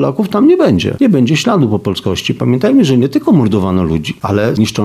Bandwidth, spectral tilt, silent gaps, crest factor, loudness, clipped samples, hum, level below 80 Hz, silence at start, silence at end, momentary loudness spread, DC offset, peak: 14.5 kHz; -6.5 dB/octave; none; 10 dB; -12 LUFS; under 0.1%; none; -40 dBFS; 0 s; 0 s; 7 LU; under 0.1%; -2 dBFS